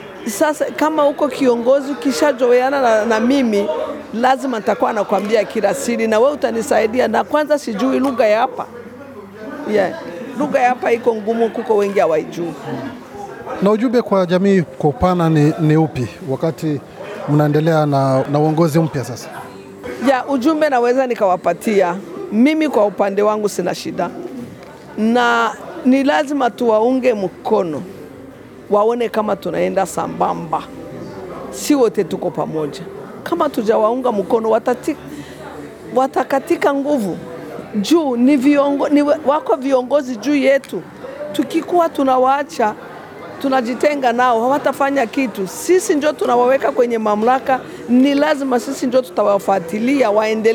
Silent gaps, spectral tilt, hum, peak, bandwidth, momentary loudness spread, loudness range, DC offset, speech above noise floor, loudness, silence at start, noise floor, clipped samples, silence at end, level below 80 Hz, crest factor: none; -6 dB/octave; none; -2 dBFS; 19 kHz; 15 LU; 4 LU; under 0.1%; 21 dB; -16 LUFS; 0 s; -37 dBFS; under 0.1%; 0 s; -52 dBFS; 14 dB